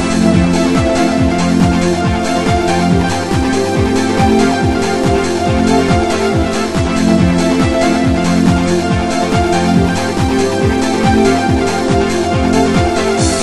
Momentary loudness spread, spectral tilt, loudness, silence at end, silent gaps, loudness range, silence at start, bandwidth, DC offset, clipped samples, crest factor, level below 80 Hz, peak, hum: 3 LU; -5.5 dB/octave; -13 LUFS; 0 s; none; 1 LU; 0 s; 12.5 kHz; 1%; under 0.1%; 12 dB; -26 dBFS; 0 dBFS; none